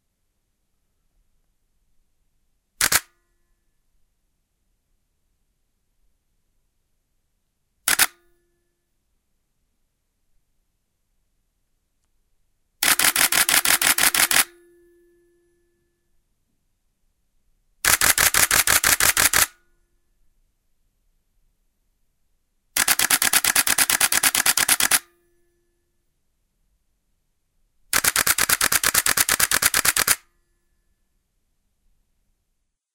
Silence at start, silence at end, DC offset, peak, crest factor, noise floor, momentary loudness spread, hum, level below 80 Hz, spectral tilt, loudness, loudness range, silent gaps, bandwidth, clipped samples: 2.8 s; 2.8 s; under 0.1%; 0 dBFS; 26 dB; -74 dBFS; 6 LU; none; -52 dBFS; 1 dB/octave; -17 LUFS; 10 LU; none; 17.5 kHz; under 0.1%